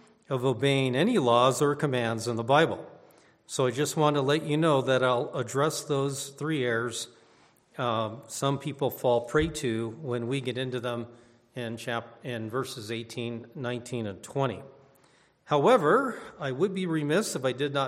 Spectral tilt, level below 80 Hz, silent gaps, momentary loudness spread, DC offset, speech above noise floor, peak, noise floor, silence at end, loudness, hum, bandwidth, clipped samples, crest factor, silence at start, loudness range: -5 dB/octave; -58 dBFS; none; 12 LU; under 0.1%; 35 dB; -8 dBFS; -63 dBFS; 0 s; -28 LUFS; none; 16 kHz; under 0.1%; 20 dB; 0.3 s; 9 LU